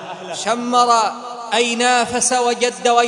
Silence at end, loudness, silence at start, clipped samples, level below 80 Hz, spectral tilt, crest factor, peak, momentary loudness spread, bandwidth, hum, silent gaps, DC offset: 0 s; -16 LUFS; 0 s; under 0.1%; -60 dBFS; -1.5 dB/octave; 16 dB; 0 dBFS; 9 LU; 11 kHz; none; none; under 0.1%